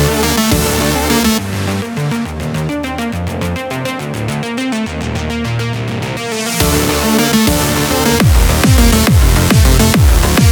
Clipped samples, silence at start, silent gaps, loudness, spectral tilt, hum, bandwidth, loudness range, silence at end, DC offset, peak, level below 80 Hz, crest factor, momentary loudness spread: under 0.1%; 0 s; none; -13 LUFS; -4.5 dB/octave; none; over 20 kHz; 8 LU; 0 s; under 0.1%; 0 dBFS; -18 dBFS; 12 dB; 10 LU